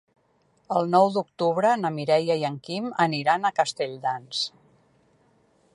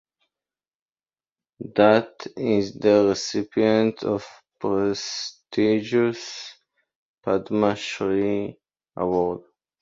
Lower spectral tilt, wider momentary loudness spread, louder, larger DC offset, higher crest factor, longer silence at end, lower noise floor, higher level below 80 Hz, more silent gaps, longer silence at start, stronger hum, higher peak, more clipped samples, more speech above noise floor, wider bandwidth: about the same, -5 dB/octave vs -5.5 dB/octave; second, 9 LU vs 16 LU; about the same, -24 LUFS vs -23 LUFS; neither; about the same, 20 dB vs 22 dB; first, 1.25 s vs 0.4 s; second, -65 dBFS vs under -90 dBFS; second, -76 dBFS vs -60 dBFS; second, none vs 6.96-7.17 s; second, 0.7 s vs 1.6 s; neither; second, -6 dBFS vs -2 dBFS; neither; second, 42 dB vs over 68 dB; first, 11.5 kHz vs 7.8 kHz